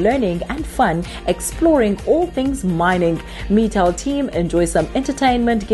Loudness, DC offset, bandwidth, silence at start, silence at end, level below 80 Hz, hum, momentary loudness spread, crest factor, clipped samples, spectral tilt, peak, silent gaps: -18 LUFS; under 0.1%; 12.5 kHz; 0 s; 0 s; -32 dBFS; none; 6 LU; 14 dB; under 0.1%; -5.5 dB/octave; -4 dBFS; none